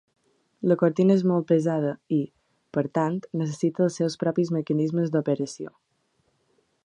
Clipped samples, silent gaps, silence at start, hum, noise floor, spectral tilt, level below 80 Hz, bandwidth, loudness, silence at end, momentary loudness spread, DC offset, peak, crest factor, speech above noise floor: under 0.1%; none; 0.6 s; none; -70 dBFS; -7.5 dB/octave; -72 dBFS; 9.8 kHz; -25 LUFS; 1.2 s; 9 LU; under 0.1%; -8 dBFS; 18 dB; 47 dB